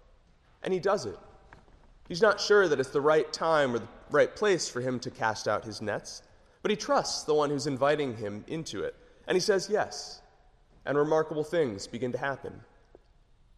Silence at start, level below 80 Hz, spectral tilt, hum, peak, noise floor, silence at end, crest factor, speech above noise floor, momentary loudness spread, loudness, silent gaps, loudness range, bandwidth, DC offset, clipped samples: 0.65 s; -60 dBFS; -4 dB/octave; none; -10 dBFS; -61 dBFS; 0.95 s; 20 dB; 33 dB; 14 LU; -29 LUFS; none; 5 LU; 13 kHz; under 0.1%; under 0.1%